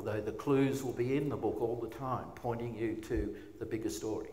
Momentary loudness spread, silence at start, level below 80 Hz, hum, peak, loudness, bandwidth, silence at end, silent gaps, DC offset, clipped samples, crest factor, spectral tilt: 8 LU; 0 s; -52 dBFS; none; -20 dBFS; -36 LUFS; 16 kHz; 0 s; none; 0.1%; under 0.1%; 16 dB; -6.5 dB/octave